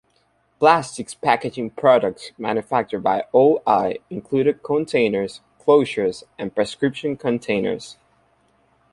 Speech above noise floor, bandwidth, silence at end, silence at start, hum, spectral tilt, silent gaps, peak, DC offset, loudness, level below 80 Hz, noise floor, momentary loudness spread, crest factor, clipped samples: 44 dB; 11.5 kHz; 1 s; 0.6 s; none; -5.5 dB/octave; none; -2 dBFS; under 0.1%; -20 LUFS; -60 dBFS; -64 dBFS; 11 LU; 20 dB; under 0.1%